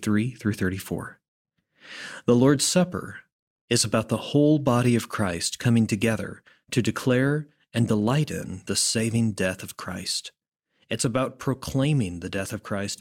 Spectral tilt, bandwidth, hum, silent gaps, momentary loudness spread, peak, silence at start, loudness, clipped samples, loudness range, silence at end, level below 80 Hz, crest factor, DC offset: -5 dB/octave; 16.5 kHz; none; 1.28-1.45 s, 3.32-3.68 s; 13 LU; -6 dBFS; 0 s; -25 LUFS; under 0.1%; 4 LU; 0.05 s; -56 dBFS; 18 dB; under 0.1%